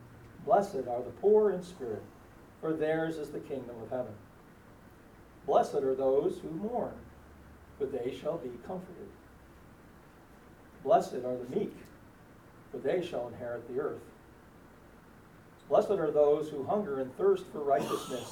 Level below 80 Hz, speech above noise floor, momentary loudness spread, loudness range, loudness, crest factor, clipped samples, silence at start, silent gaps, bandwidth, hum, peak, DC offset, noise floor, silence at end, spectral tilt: -62 dBFS; 24 dB; 16 LU; 8 LU; -32 LUFS; 20 dB; under 0.1%; 0 s; none; 17 kHz; none; -12 dBFS; under 0.1%; -56 dBFS; 0 s; -6.5 dB/octave